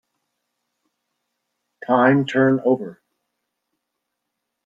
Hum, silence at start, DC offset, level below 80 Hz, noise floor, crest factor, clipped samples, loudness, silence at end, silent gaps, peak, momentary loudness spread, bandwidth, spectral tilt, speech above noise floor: none; 1.9 s; under 0.1%; -68 dBFS; -79 dBFS; 20 dB; under 0.1%; -18 LUFS; 1.75 s; none; -4 dBFS; 17 LU; 7.6 kHz; -8 dB/octave; 62 dB